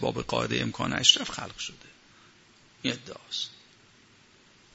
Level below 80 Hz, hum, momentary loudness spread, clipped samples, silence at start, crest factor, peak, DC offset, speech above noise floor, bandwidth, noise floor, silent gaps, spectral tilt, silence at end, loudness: -58 dBFS; none; 17 LU; under 0.1%; 0 s; 28 dB; -2 dBFS; under 0.1%; 30 dB; 8.2 kHz; -58 dBFS; none; -2.5 dB/octave; 1.2 s; -27 LUFS